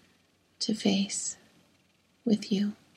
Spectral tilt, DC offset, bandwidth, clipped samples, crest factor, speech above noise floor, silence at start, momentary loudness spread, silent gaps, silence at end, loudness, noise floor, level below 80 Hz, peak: -4.5 dB/octave; under 0.1%; 11.5 kHz; under 0.1%; 20 dB; 39 dB; 0.6 s; 9 LU; none; 0.2 s; -30 LUFS; -67 dBFS; -76 dBFS; -12 dBFS